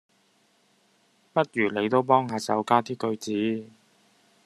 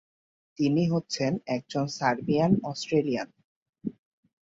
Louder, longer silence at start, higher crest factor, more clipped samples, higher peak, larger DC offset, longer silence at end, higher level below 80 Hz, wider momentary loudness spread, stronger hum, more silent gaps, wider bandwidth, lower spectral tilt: about the same, -25 LUFS vs -27 LUFS; first, 1.35 s vs 0.6 s; about the same, 22 dB vs 18 dB; neither; first, -6 dBFS vs -10 dBFS; neither; first, 0.8 s vs 0.6 s; second, -72 dBFS vs -64 dBFS; second, 8 LU vs 15 LU; neither; second, none vs 3.44-3.73 s; first, 13 kHz vs 8 kHz; about the same, -5.5 dB/octave vs -6 dB/octave